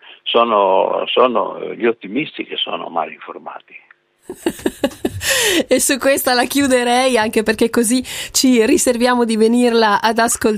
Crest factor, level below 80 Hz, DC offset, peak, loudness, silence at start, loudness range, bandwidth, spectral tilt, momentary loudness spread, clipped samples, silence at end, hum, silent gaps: 16 dB; -48 dBFS; under 0.1%; 0 dBFS; -15 LUFS; 0.25 s; 9 LU; 15.5 kHz; -2.5 dB/octave; 10 LU; under 0.1%; 0 s; none; none